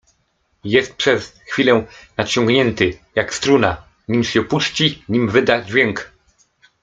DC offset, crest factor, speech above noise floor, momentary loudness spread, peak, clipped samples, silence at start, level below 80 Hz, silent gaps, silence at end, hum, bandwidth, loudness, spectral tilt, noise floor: under 0.1%; 18 dB; 48 dB; 9 LU; 0 dBFS; under 0.1%; 0.65 s; -50 dBFS; none; 0.75 s; none; 9.4 kHz; -17 LUFS; -4.5 dB/octave; -65 dBFS